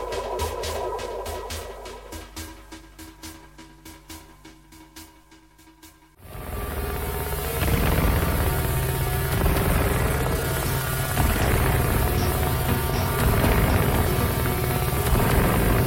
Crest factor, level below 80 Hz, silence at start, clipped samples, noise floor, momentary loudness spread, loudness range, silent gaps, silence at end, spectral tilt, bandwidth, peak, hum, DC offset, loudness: 16 dB; -30 dBFS; 0 s; under 0.1%; -52 dBFS; 21 LU; 20 LU; none; 0 s; -5 dB/octave; 17 kHz; -8 dBFS; none; under 0.1%; -24 LUFS